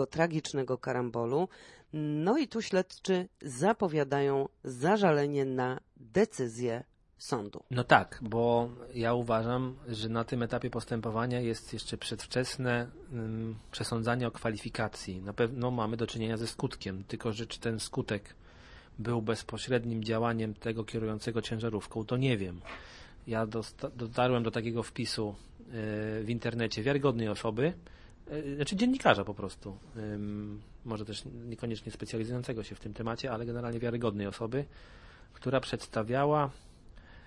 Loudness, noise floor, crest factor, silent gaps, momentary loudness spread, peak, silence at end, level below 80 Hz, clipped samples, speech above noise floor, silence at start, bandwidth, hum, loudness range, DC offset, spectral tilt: -33 LUFS; -53 dBFS; 28 dB; none; 11 LU; -6 dBFS; 0 s; -56 dBFS; under 0.1%; 21 dB; 0 s; 11.5 kHz; none; 6 LU; under 0.1%; -6 dB/octave